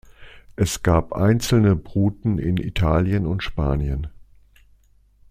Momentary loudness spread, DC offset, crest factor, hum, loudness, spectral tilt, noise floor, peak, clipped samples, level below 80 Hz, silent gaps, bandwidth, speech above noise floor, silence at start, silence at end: 8 LU; under 0.1%; 18 dB; none; -21 LUFS; -6.5 dB/octave; -56 dBFS; -2 dBFS; under 0.1%; -34 dBFS; none; 15.5 kHz; 36 dB; 0.2 s; 1.1 s